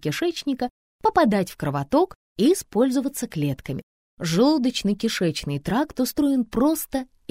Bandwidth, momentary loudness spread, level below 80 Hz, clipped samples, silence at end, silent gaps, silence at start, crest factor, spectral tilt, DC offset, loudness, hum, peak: 16 kHz; 9 LU; -50 dBFS; under 0.1%; 0.25 s; 0.70-0.99 s, 2.15-2.35 s, 3.83-4.17 s; 0.05 s; 16 dB; -5.5 dB/octave; under 0.1%; -23 LUFS; none; -6 dBFS